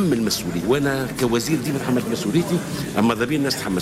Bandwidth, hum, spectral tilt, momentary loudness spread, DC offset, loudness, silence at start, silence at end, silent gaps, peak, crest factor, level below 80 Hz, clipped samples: 16 kHz; none; -5 dB/octave; 3 LU; under 0.1%; -21 LUFS; 0 s; 0 s; none; -8 dBFS; 12 dB; -46 dBFS; under 0.1%